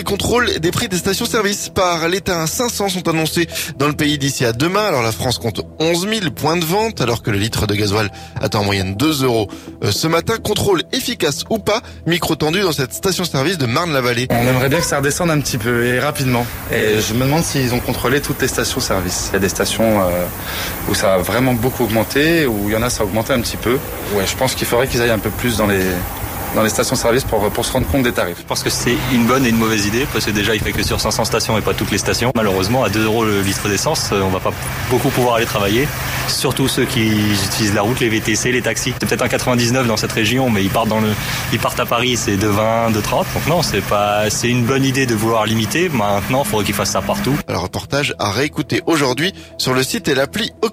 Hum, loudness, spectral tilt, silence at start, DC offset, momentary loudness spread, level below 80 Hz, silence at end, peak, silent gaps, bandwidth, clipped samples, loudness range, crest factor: none; -17 LUFS; -4 dB/octave; 0 s; under 0.1%; 4 LU; -36 dBFS; 0 s; -4 dBFS; none; 16 kHz; under 0.1%; 2 LU; 12 dB